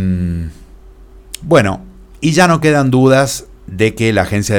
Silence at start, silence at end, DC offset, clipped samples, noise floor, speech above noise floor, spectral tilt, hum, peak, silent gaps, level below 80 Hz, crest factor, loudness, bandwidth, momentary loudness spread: 0 s; 0 s; under 0.1%; under 0.1%; -38 dBFS; 27 dB; -5.5 dB/octave; none; 0 dBFS; none; -36 dBFS; 14 dB; -13 LUFS; 18 kHz; 18 LU